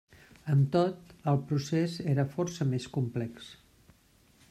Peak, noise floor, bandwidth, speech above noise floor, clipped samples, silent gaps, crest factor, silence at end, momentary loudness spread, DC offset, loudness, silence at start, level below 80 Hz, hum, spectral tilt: -14 dBFS; -63 dBFS; 11.5 kHz; 34 dB; under 0.1%; none; 18 dB; 0.95 s; 12 LU; under 0.1%; -31 LUFS; 0.45 s; -66 dBFS; none; -7.5 dB/octave